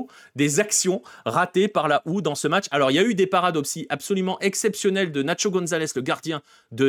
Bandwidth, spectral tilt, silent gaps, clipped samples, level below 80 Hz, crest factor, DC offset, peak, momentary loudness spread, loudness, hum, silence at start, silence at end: 18 kHz; -4 dB/octave; none; under 0.1%; -70 dBFS; 18 dB; under 0.1%; -6 dBFS; 8 LU; -22 LUFS; none; 0 s; 0 s